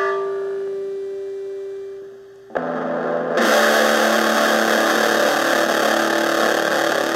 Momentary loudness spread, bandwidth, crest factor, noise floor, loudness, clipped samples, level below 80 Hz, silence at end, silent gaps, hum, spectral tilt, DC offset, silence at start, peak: 14 LU; 16 kHz; 16 dB; -40 dBFS; -18 LUFS; under 0.1%; -72 dBFS; 0 s; none; none; -2.5 dB/octave; under 0.1%; 0 s; -2 dBFS